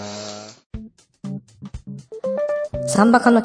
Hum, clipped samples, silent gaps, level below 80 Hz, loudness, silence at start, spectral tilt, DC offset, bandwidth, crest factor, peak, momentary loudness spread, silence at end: none; under 0.1%; 0.66-0.70 s; -46 dBFS; -19 LUFS; 0 s; -5.5 dB/octave; under 0.1%; 10.5 kHz; 20 dB; -2 dBFS; 23 LU; 0 s